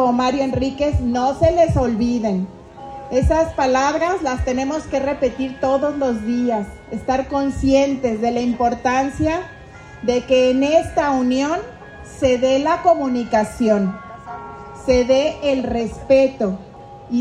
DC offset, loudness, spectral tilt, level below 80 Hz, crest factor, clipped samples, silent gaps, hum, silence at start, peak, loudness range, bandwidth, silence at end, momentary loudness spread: under 0.1%; -19 LUFS; -6 dB/octave; -36 dBFS; 16 dB; under 0.1%; none; none; 0 s; -4 dBFS; 2 LU; 11.5 kHz; 0 s; 14 LU